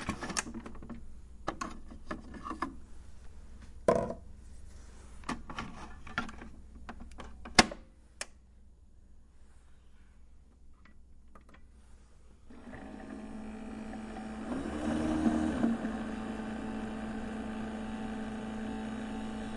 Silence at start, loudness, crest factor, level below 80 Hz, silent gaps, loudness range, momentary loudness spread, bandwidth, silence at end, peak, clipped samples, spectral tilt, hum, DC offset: 0 s; -36 LUFS; 34 dB; -50 dBFS; none; 15 LU; 23 LU; 11.5 kHz; 0 s; -4 dBFS; under 0.1%; -4 dB/octave; none; under 0.1%